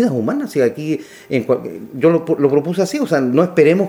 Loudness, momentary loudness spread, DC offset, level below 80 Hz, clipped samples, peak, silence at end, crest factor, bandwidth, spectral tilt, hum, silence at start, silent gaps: -17 LUFS; 9 LU; under 0.1%; -62 dBFS; under 0.1%; 0 dBFS; 0 s; 16 dB; 17 kHz; -7 dB/octave; none; 0 s; none